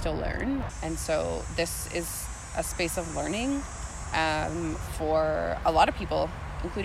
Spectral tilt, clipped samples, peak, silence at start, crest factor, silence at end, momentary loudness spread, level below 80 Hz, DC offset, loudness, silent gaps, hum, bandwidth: -4.5 dB/octave; under 0.1%; -8 dBFS; 0 s; 20 dB; 0 s; 9 LU; -40 dBFS; under 0.1%; -29 LUFS; none; none; 16 kHz